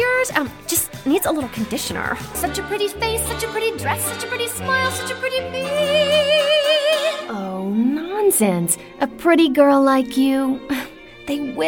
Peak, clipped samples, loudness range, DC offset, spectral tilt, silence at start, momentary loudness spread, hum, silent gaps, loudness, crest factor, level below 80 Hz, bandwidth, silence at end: -2 dBFS; under 0.1%; 5 LU; under 0.1%; -3.5 dB/octave; 0 s; 9 LU; none; none; -19 LUFS; 16 dB; -46 dBFS; 18 kHz; 0 s